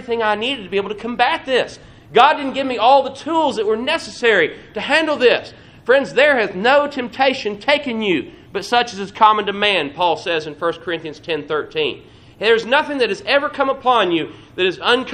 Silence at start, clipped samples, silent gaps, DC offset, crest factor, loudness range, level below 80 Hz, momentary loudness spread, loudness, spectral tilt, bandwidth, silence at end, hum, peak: 0 s; under 0.1%; none; under 0.1%; 18 dB; 3 LU; -54 dBFS; 10 LU; -17 LUFS; -4 dB/octave; 10.5 kHz; 0 s; none; 0 dBFS